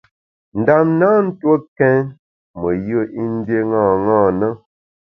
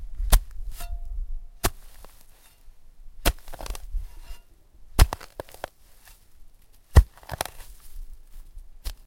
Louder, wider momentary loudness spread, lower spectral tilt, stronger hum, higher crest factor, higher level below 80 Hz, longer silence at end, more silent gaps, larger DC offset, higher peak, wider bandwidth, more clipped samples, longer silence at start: first, -16 LUFS vs -28 LUFS; second, 9 LU vs 27 LU; first, -11.5 dB/octave vs -4.5 dB/octave; neither; second, 16 dB vs 26 dB; second, -50 dBFS vs -28 dBFS; first, 0.55 s vs 0.05 s; first, 1.68-1.76 s, 2.19-2.54 s vs none; neither; about the same, 0 dBFS vs -2 dBFS; second, 5.6 kHz vs 17 kHz; neither; first, 0.55 s vs 0 s